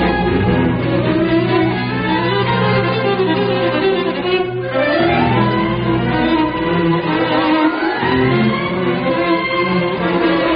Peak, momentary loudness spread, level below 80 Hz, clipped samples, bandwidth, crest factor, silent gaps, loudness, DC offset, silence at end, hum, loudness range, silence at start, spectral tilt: -4 dBFS; 3 LU; -36 dBFS; under 0.1%; 5.2 kHz; 12 dB; none; -15 LUFS; under 0.1%; 0 s; none; 0 LU; 0 s; -12 dB/octave